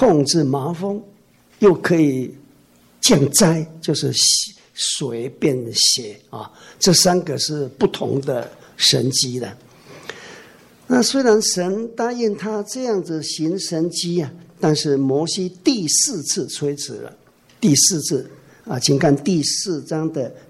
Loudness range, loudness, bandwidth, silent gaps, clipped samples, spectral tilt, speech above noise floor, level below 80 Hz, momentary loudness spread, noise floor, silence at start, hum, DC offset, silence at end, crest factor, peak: 4 LU; -18 LUFS; 16 kHz; none; under 0.1%; -3.5 dB/octave; 34 dB; -56 dBFS; 15 LU; -52 dBFS; 0 s; none; under 0.1%; 0.1 s; 16 dB; -4 dBFS